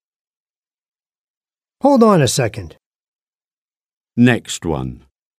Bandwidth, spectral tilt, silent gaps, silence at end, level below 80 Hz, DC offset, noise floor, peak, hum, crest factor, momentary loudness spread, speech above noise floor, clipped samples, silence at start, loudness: 15.5 kHz; -5.5 dB/octave; 2.86-2.91 s, 3.08-3.14 s, 3.22-3.27 s, 3.35-3.40 s, 3.53-3.68 s, 3.93-4.01 s; 0.45 s; -46 dBFS; under 0.1%; under -90 dBFS; 0 dBFS; none; 18 dB; 16 LU; over 75 dB; under 0.1%; 1.85 s; -15 LUFS